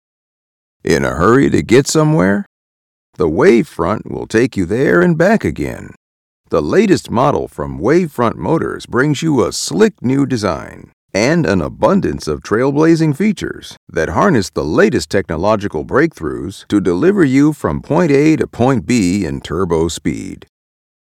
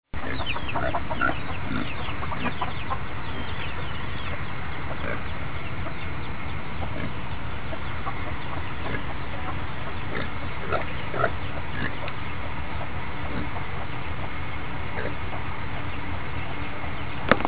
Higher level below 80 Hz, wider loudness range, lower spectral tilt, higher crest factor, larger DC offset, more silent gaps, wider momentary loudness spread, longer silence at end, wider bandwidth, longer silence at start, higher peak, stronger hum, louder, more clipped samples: about the same, -38 dBFS vs -38 dBFS; about the same, 2 LU vs 3 LU; second, -6 dB/octave vs -9.5 dB/octave; second, 14 dB vs 30 dB; second, 0.1% vs 5%; first, 2.46-3.13 s, 5.97-6.44 s, 10.93-11.09 s, 13.77-13.87 s vs none; first, 11 LU vs 5 LU; first, 0.7 s vs 0 s; first, 15.5 kHz vs 4 kHz; first, 0.85 s vs 0.05 s; about the same, 0 dBFS vs 0 dBFS; neither; first, -14 LUFS vs -31 LUFS; first, 0.1% vs under 0.1%